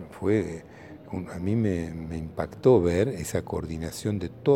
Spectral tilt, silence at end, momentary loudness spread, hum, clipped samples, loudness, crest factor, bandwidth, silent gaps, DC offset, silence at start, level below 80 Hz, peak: -7 dB/octave; 0 s; 15 LU; none; under 0.1%; -27 LUFS; 20 dB; 17 kHz; none; under 0.1%; 0 s; -48 dBFS; -8 dBFS